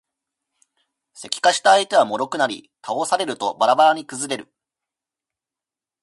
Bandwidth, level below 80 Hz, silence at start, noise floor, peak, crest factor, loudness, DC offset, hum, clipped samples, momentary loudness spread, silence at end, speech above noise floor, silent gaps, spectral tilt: 11.5 kHz; -74 dBFS; 1.2 s; -89 dBFS; -2 dBFS; 20 dB; -19 LUFS; under 0.1%; none; under 0.1%; 14 LU; 1.6 s; 70 dB; none; -2 dB/octave